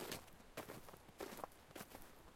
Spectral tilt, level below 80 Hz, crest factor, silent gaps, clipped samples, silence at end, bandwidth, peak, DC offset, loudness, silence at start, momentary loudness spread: -3.5 dB/octave; -70 dBFS; 26 dB; none; under 0.1%; 0 s; 16.5 kHz; -28 dBFS; under 0.1%; -54 LUFS; 0 s; 6 LU